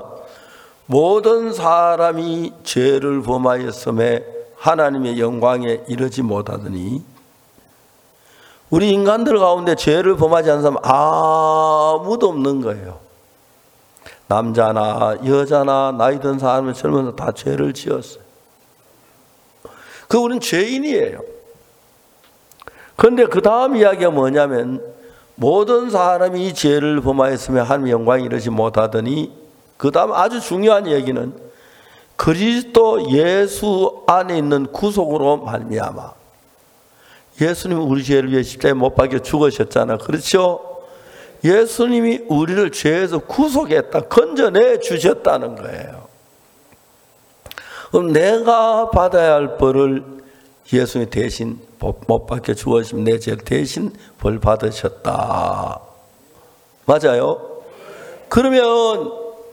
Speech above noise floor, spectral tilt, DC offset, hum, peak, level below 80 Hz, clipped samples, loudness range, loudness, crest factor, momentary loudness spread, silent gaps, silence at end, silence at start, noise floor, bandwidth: 37 dB; -6 dB/octave; under 0.1%; none; 0 dBFS; -42 dBFS; under 0.1%; 6 LU; -16 LUFS; 18 dB; 12 LU; none; 0 s; 0 s; -52 dBFS; 18.5 kHz